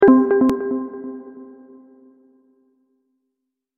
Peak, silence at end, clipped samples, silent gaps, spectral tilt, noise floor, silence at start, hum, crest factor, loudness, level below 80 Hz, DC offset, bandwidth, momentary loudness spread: -2 dBFS; 2.35 s; under 0.1%; none; -8 dB/octave; -79 dBFS; 0 s; none; 20 dB; -18 LUFS; -58 dBFS; under 0.1%; 4 kHz; 27 LU